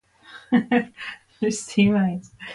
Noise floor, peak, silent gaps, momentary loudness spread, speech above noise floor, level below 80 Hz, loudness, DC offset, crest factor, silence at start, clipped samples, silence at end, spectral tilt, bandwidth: -47 dBFS; -6 dBFS; none; 15 LU; 25 dB; -58 dBFS; -22 LUFS; under 0.1%; 16 dB; 0.3 s; under 0.1%; 0 s; -5.5 dB/octave; 11.5 kHz